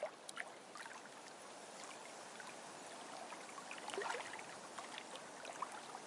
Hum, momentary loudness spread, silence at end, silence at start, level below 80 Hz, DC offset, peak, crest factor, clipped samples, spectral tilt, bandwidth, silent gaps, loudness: none; 8 LU; 0 s; 0 s; under -90 dBFS; under 0.1%; -24 dBFS; 26 dB; under 0.1%; -1.5 dB/octave; 11.5 kHz; none; -50 LUFS